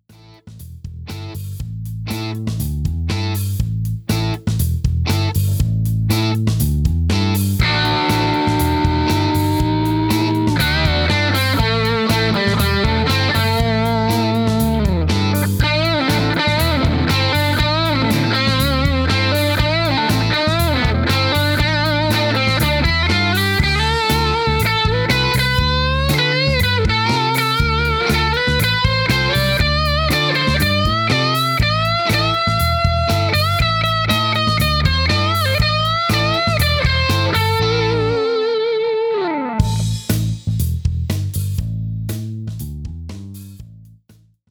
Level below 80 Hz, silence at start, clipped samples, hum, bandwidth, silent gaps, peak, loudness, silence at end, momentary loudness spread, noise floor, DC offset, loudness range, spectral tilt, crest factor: -28 dBFS; 0.45 s; under 0.1%; none; over 20 kHz; none; 0 dBFS; -16 LUFS; 0.65 s; 7 LU; -51 dBFS; under 0.1%; 5 LU; -5 dB/octave; 16 dB